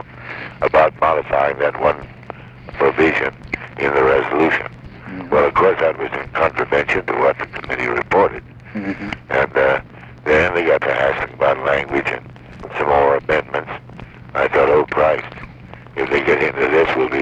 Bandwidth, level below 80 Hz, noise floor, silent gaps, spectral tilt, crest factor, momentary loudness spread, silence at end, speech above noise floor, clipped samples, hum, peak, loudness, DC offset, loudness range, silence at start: 8.2 kHz; -42 dBFS; -38 dBFS; none; -6.5 dB/octave; 16 dB; 17 LU; 0 s; 21 dB; under 0.1%; none; -2 dBFS; -17 LUFS; under 0.1%; 2 LU; 0 s